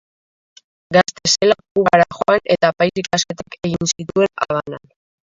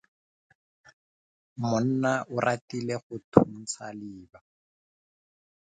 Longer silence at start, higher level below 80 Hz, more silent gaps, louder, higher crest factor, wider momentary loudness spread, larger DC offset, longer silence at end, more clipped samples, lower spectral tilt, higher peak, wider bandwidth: second, 0.9 s vs 1.55 s; first, -52 dBFS vs -62 dBFS; second, 1.71-1.75 s vs 2.61-2.68 s, 3.03-3.10 s, 3.24-3.32 s; first, -17 LUFS vs -28 LUFS; second, 18 dB vs 30 dB; second, 9 LU vs 19 LU; neither; second, 0.55 s vs 1.35 s; neither; second, -3.5 dB/octave vs -6 dB/octave; about the same, 0 dBFS vs 0 dBFS; second, 7.8 kHz vs 9.6 kHz